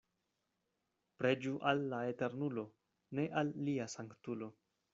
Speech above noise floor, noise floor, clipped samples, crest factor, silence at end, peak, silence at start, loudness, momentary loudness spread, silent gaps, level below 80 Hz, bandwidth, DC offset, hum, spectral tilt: 47 dB; -86 dBFS; under 0.1%; 22 dB; 0.4 s; -18 dBFS; 1.2 s; -39 LUFS; 10 LU; none; -80 dBFS; 7.6 kHz; under 0.1%; none; -5 dB/octave